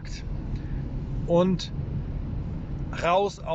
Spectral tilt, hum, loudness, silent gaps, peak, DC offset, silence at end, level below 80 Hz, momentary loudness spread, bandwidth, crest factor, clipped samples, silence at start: -7 dB/octave; none; -28 LUFS; none; -10 dBFS; under 0.1%; 0 s; -36 dBFS; 11 LU; 8 kHz; 16 dB; under 0.1%; 0 s